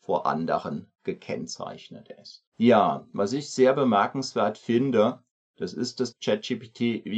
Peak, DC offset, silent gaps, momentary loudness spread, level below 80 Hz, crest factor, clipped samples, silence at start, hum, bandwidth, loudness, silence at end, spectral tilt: -6 dBFS; under 0.1%; 2.47-2.52 s, 5.31-5.54 s; 17 LU; -72 dBFS; 20 dB; under 0.1%; 0.1 s; none; 8.8 kHz; -26 LUFS; 0 s; -5.5 dB/octave